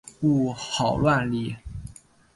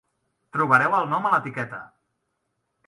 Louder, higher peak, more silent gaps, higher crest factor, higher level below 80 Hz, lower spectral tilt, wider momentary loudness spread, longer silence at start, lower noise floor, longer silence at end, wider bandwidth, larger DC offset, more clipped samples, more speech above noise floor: about the same, -24 LUFS vs -22 LUFS; second, -10 dBFS vs -4 dBFS; neither; second, 16 dB vs 22 dB; first, -46 dBFS vs -72 dBFS; about the same, -6 dB/octave vs -6.5 dB/octave; first, 18 LU vs 14 LU; second, 0.05 s vs 0.55 s; second, -45 dBFS vs -76 dBFS; second, 0.45 s vs 1 s; about the same, 11.5 kHz vs 11.5 kHz; neither; neither; second, 22 dB vs 54 dB